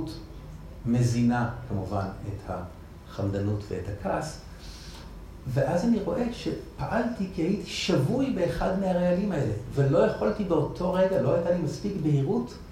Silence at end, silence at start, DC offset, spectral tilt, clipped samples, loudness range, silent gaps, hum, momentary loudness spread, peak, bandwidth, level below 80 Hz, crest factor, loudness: 0 s; 0 s; under 0.1%; -7 dB/octave; under 0.1%; 7 LU; none; none; 18 LU; -12 dBFS; 15 kHz; -46 dBFS; 16 dB; -28 LUFS